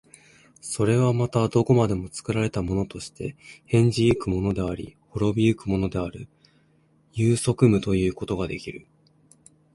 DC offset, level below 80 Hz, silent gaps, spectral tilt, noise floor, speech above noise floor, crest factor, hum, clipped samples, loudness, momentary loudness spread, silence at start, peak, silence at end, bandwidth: under 0.1%; -44 dBFS; none; -6.5 dB/octave; -62 dBFS; 38 dB; 20 dB; none; under 0.1%; -24 LUFS; 15 LU; 0.65 s; -4 dBFS; 0.95 s; 11.5 kHz